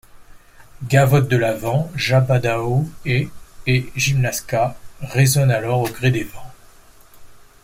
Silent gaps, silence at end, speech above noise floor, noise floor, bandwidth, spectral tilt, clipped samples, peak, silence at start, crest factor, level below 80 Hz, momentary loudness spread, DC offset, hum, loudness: none; 0.25 s; 28 dB; -46 dBFS; 16.5 kHz; -5.5 dB/octave; under 0.1%; -2 dBFS; 0.2 s; 16 dB; -44 dBFS; 10 LU; under 0.1%; none; -19 LUFS